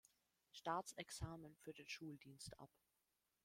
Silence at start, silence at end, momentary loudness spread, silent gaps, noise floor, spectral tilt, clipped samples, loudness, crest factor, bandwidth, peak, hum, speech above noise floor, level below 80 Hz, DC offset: 0.55 s; 0.8 s; 14 LU; none; -89 dBFS; -4 dB/octave; under 0.1%; -52 LUFS; 24 dB; 16.5 kHz; -30 dBFS; none; 36 dB; -72 dBFS; under 0.1%